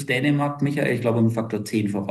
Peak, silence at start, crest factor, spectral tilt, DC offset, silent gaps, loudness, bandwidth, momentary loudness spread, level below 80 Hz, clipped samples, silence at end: -8 dBFS; 0 s; 14 dB; -7 dB/octave; under 0.1%; none; -23 LUFS; 12.5 kHz; 4 LU; -66 dBFS; under 0.1%; 0 s